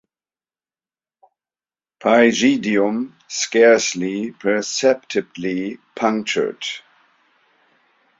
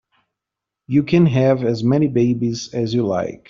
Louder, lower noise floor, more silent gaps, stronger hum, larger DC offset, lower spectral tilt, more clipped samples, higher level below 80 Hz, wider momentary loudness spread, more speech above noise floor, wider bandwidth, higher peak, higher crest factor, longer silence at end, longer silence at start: about the same, -19 LUFS vs -18 LUFS; first, under -90 dBFS vs -84 dBFS; neither; neither; neither; second, -3.5 dB/octave vs -7.5 dB/octave; neither; second, -66 dBFS vs -54 dBFS; first, 13 LU vs 7 LU; first, over 72 dB vs 67 dB; about the same, 7.8 kHz vs 7.4 kHz; about the same, -2 dBFS vs -4 dBFS; about the same, 18 dB vs 14 dB; first, 1.4 s vs 0.15 s; first, 2 s vs 0.9 s